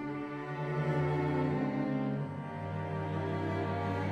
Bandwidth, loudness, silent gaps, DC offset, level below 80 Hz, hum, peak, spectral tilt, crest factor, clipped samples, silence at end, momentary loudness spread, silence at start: 8.2 kHz; -34 LUFS; none; under 0.1%; -62 dBFS; none; -20 dBFS; -8.5 dB/octave; 14 dB; under 0.1%; 0 s; 7 LU; 0 s